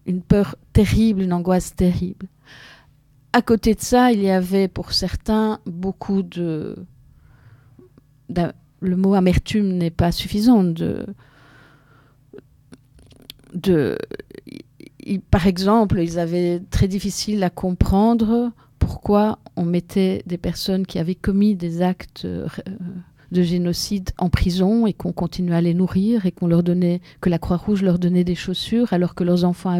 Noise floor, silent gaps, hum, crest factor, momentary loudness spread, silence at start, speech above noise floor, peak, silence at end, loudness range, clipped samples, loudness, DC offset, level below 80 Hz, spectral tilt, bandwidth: -54 dBFS; none; none; 18 dB; 12 LU; 0.05 s; 35 dB; -2 dBFS; 0 s; 6 LU; under 0.1%; -20 LUFS; under 0.1%; -36 dBFS; -6.5 dB/octave; 15.5 kHz